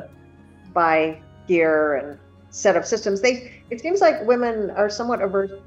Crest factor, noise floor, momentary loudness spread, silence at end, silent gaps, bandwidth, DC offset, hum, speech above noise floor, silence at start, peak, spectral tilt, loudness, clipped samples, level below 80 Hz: 16 dB; -48 dBFS; 12 LU; 0.05 s; none; 8.2 kHz; under 0.1%; none; 27 dB; 0 s; -6 dBFS; -4 dB/octave; -21 LUFS; under 0.1%; -58 dBFS